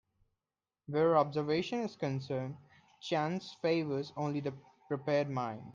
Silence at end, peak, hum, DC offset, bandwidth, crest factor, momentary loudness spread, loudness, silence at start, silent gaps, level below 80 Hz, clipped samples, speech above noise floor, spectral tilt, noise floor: 0 s; -14 dBFS; none; under 0.1%; 7.4 kHz; 20 dB; 12 LU; -34 LUFS; 0.9 s; none; -76 dBFS; under 0.1%; over 56 dB; -7 dB/octave; under -90 dBFS